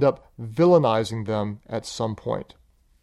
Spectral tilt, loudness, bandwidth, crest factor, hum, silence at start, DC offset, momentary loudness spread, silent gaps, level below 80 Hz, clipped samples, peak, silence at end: -7 dB/octave; -24 LUFS; 12 kHz; 18 dB; none; 0 s; under 0.1%; 14 LU; none; -56 dBFS; under 0.1%; -6 dBFS; 0.6 s